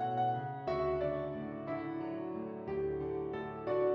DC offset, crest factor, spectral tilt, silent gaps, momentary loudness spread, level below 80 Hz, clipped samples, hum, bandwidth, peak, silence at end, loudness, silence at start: under 0.1%; 14 dB; -9.5 dB/octave; none; 7 LU; -60 dBFS; under 0.1%; none; 5.8 kHz; -22 dBFS; 0 s; -37 LUFS; 0 s